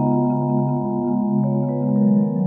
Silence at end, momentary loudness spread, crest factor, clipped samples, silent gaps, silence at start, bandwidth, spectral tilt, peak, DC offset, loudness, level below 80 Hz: 0 s; 4 LU; 12 dB; under 0.1%; none; 0 s; 2 kHz; -14.5 dB/octave; -8 dBFS; under 0.1%; -20 LUFS; -56 dBFS